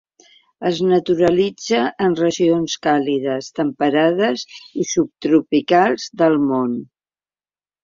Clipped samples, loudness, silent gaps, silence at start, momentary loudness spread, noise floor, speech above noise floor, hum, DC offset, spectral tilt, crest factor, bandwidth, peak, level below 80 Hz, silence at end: under 0.1%; -18 LUFS; none; 0.6 s; 8 LU; under -90 dBFS; over 73 dB; none; under 0.1%; -5 dB/octave; 16 dB; 7.6 kHz; -2 dBFS; -58 dBFS; 1 s